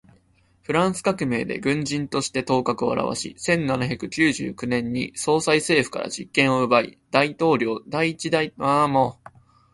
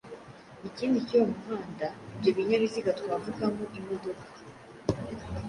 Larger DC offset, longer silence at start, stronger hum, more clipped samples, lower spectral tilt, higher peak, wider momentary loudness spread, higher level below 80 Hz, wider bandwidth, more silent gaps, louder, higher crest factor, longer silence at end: neither; first, 0.7 s vs 0.05 s; neither; neither; second, -4.5 dB/octave vs -6.5 dB/octave; first, -2 dBFS vs -12 dBFS; second, 7 LU vs 21 LU; about the same, -56 dBFS vs -54 dBFS; about the same, 11.5 kHz vs 11 kHz; neither; first, -22 LUFS vs -31 LUFS; about the same, 20 dB vs 20 dB; first, 0.6 s vs 0 s